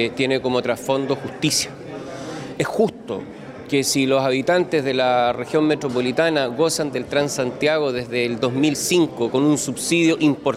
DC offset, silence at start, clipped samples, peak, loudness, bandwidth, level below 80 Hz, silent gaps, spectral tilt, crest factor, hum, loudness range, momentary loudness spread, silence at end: under 0.1%; 0 s; under 0.1%; -6 dBFS; -20 LUFS; 16 kHz; -58 dBFS; none; -4 dB/octave; 14 dB; none; 4 LU; 12 LU; 0 s